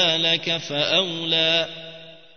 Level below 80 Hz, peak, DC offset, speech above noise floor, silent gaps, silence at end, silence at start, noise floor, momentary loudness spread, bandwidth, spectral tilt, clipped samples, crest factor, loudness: -70 dBFS; -6 dBFS; 0.3%; 20 dB; none; 0.2 s; 0 s; -42 dBFS; 13 LU; 6.6 kHz; -3 dB/octave; under 0.1%; 18 dB; -20 LUFS